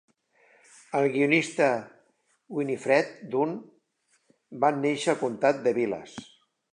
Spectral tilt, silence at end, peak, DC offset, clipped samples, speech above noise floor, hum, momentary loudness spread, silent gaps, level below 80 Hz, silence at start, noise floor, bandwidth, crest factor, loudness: -5 dB/octave; 0.5 s; -8 dBFS; under 0.1%; under 0.1%; 45 dB; none; 13 LU; none; -78 dBFS; 0.9 s; -71 dBFS; 11 kHz; 20 dB; -26 LUFS